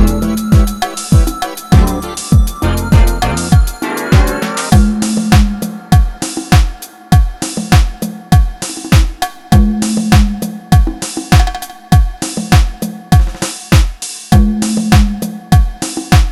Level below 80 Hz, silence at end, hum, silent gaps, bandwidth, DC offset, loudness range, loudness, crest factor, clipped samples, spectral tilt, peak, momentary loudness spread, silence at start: -14 dBFS; 0 s; none; none; 15 kHz; under 0.1%; 1 LU; -13 LUFS; 10 dB; 0.4%; -5.5 dB/octave; 0 dBFS; 9 LU; 0 s